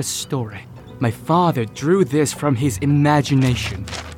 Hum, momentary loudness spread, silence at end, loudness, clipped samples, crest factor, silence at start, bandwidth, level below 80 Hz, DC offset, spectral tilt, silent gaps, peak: none; 11 LU; 0 s; -19 LUFS; under 0.1%; 14 dB; 0 s; 16.5 kHz; -46 dBFS; under 0.1%; -5.5 dB/octave; none; -4 dBFS